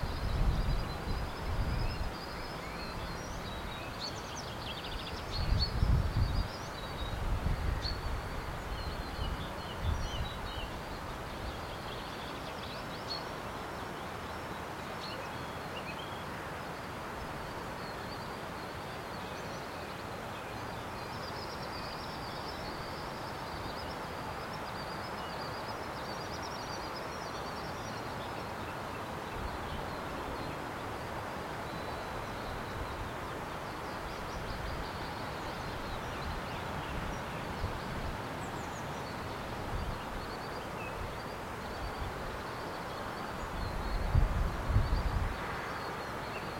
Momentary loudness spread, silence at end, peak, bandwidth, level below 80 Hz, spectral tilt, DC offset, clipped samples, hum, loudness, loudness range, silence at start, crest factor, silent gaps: 6 LU; 0 s; -16 dBFS; 16.5 kHz; -42 dBFS; -5 dB/octave; under 0.1%; under 0.1%; none; -39 LUFS; 5 LU; 0 s; 22 dB; none